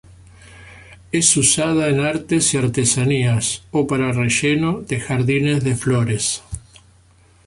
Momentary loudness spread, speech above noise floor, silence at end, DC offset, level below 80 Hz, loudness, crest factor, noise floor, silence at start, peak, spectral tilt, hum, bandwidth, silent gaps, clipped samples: 7 LU; 34 dB; 0.9 s; under 0.1%; -46 dBFS; -18 LUFS; 18 dB; -52 dBFS; 0.45 s; -2 dBFS; -4 dB/octave; none; 11.5 kHz; none; under 0.1%